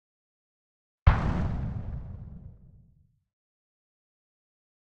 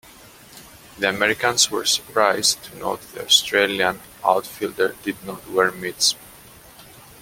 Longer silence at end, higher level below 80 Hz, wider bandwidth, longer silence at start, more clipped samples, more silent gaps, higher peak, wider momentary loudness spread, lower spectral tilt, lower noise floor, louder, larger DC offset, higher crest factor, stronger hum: first, 2.5 s vs 0.2 s; first, -36 dBFS vs -58 dBFS; second, 6.6 kHz vs 17 kHz; first, 1.05 s vs 0.55 s; neither; neither; about the same, -4 dBFS vs -2 dBFS; first, 22 LU vs 13 LU; first, -8.5 dB/octave vs -1 dB/octave; first, -63 dBFS vs -46 dBFS; second, -30 LUFS vs -20 LUFS; neither; first, 28 dB vs 22 dB; neither